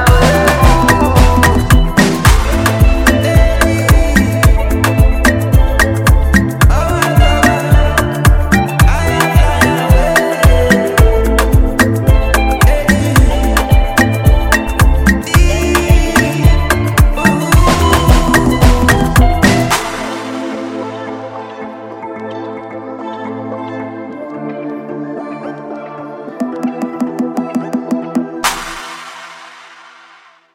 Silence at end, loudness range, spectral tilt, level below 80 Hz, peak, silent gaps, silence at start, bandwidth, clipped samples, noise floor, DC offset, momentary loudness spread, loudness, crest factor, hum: 0.95 s; 13 LU; -5.5 dB/octave; -14 dBFS; 0 dBFS; none; 0 s; 17 kHz; under 0.1%; -43 dBFS; under 0.1%; 15 LU; -11 LUFS; 10 dB; none